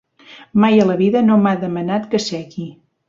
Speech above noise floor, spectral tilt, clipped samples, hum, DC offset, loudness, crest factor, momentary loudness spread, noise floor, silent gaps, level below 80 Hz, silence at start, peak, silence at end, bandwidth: 28 dB; -6.5 dB/octave; under 0.1%; none; under 0.1%; -16 LUFS; 16 dB; 16 LU; -43 dBFS; none; -58 dBFS; 0.3 s; -2 dBFS; 0.35 s; 7.6 kHz